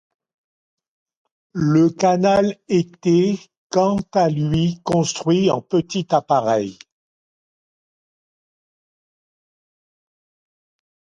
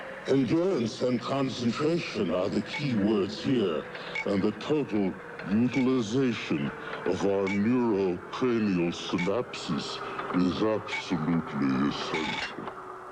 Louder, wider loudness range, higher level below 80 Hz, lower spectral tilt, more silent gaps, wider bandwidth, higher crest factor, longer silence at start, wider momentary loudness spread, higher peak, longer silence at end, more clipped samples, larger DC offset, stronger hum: first, -19 LUFS vs -28 LUFS; first, 7 LU vs 2 LU; first, -52 dBFS vs -62 dBFS; about the same, -6.5 dB/octave vs -6 dB/octave; first, 3.57-3.70 s vs none; about the same, 9.8 kHz vs 10 kHz; about the same, 18 dB vs 14 dB; first, 1.55 s vs 0 s; about the same, 6 LU vs 7 LU; first, -4 dBFS vs -14 dBFS; first, 4.45 s vs 0 s; neither; neither; neither